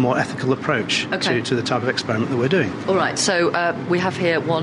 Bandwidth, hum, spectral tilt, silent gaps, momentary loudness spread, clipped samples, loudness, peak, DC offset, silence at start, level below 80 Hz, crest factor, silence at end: 11.5 kHz; none; -4.5 dB/octave; none; 3 LU; under 0.1%; -20 LUFS; -4 dBFS; under 0.1%; 0 s; -58 dBFS; 16 dB; 0 s